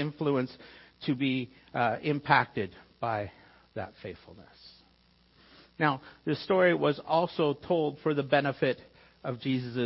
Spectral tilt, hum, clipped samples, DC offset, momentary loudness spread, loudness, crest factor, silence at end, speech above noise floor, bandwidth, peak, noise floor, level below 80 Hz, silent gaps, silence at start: -10 dB/octave; none; under 0.1%; under 0.1%; 16 LU; -30 LUFS; 24 dB; 0 s; 34 dB; 5.8 kHz; -8 dBFS; -64 dBFS; -66 dBFS; none; 0 s